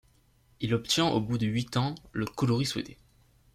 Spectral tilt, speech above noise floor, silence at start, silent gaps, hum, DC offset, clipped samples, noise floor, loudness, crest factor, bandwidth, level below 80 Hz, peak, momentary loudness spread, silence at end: -5 dB/octave; 35 dB; 0.6 s; none; none; under 0.1%; under 0.1%; -64 dBFS; -29 LUFS; 20 dB; 15 kHz; -58 dBFS; -10 dBFS; 10 LU; 0.6 s